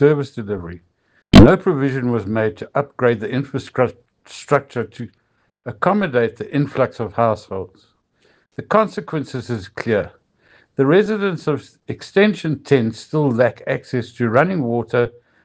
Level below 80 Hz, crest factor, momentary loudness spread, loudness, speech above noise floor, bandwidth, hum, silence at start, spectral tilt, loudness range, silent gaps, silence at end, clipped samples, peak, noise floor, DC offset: -36 dBFS; 18 dB; 15 LU; -18 LUFS; 41 dB; 9.2 kHz; none; 0 s; -7.5 dB/octave; 6 LU; none; 0.35 s; 0.2%; 0 dBFS; -59 dBFS; under 0.1%